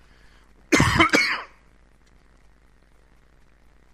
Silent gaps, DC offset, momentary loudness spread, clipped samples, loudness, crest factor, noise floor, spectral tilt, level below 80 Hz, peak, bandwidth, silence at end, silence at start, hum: none; under 0.1%; 13 LU; under 0.1%; -19 LUFS; 24 dB; -55 dBFS; -4 dB/octave; -44 dBFS; -2 dBFS; 15 kHz; 2.5 s; 0.7 s; none